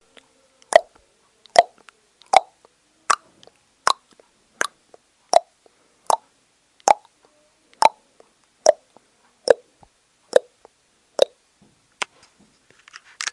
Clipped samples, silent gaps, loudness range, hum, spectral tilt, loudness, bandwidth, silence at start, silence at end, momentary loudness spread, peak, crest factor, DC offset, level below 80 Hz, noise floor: under 0.1%; none; 3 LU; none; 0 dB/octave; -21 LUFS; 11.5 kHz; 0.75 s; 0.05 s; 13 LU; 0 dBFS; 24 dB; under 0.1%; -68 dBFS; -63 dBFS